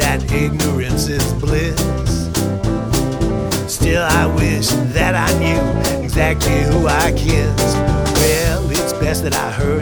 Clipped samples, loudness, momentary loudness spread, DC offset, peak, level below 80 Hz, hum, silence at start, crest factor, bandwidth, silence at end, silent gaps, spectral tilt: under 0.1%; -16 LUFS; 4 LU; under 0.1%; -2 dBFS; -24 dBFS; none; 0 s; 14 dB; over 20 kHz; 0 s; none; -5 dB/octave